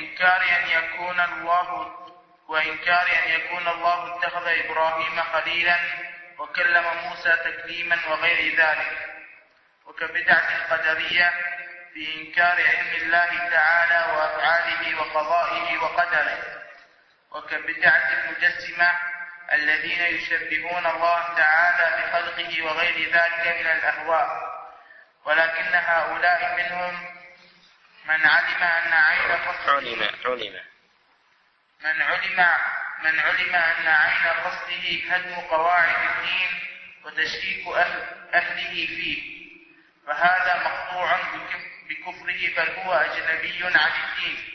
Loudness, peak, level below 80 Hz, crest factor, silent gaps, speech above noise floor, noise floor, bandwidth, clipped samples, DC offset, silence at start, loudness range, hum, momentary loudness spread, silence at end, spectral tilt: -21 LUFS; -4 dBFS; -62 dBFS; 20 dB; none; 40 dB; -63 dBFS; 6.4 kHz; under 0.1%; under 0.1%; 0 s; 4 LU; none; 12 LU; 0 s; -3 dB/octave